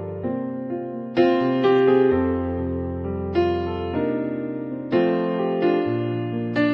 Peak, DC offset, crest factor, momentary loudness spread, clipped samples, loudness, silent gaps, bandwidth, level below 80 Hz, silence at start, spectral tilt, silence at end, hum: -6 dBFS; under 0.1%; 16 dB; 10 LU; under 0.1%; -22 LUFS; none; 5.8 kHz; -46 dBFS; 0 s; -9 dB/octave; 0 s; none